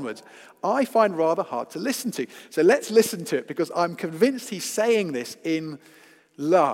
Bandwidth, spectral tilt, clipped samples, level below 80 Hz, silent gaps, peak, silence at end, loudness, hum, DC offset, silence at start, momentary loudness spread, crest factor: 16.5 kHz; -4.5 dB/octave; under 0.1%; -82 dBFS; none; -6 dBFS; 0 s; -24 LUFS; none; under 0.1%; 0 s; 11 LU; 18 dB